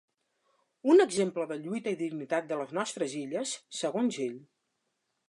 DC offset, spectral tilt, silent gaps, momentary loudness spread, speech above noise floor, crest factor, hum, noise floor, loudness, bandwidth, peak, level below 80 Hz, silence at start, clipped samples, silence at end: under 0.1%; -4.5 dB/octave; none; 12 LU; 51 dB; 20 dB; none; -80 dBFS; -30 LUFS; 11.5 kHz; -12 dBFS; -84 dBFS; 0.85 s; under 0.1%; 0.85 s